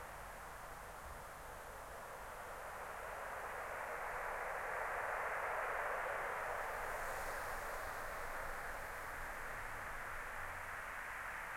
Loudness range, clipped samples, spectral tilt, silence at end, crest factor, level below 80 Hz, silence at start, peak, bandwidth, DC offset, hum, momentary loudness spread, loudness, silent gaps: 7 LU; under 0.1%; -3 dB/octave; 0 s; 16 dB; -58 dBFS; 0 s; -28 dBFS; 16.5 kHz; under 0.1%; none; 10 LU; -45 LUFS; none